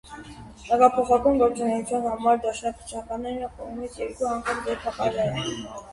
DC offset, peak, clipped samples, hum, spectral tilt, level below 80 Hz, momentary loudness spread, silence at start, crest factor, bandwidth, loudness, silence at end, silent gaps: under 0.1%; -4 dBFS; under 0.1%; none; -5 dB/octave; -50 dBFS; 16 LU; 0.05 s; 20 dB; 11.5 kHz; -25 LUFS; 0 s; none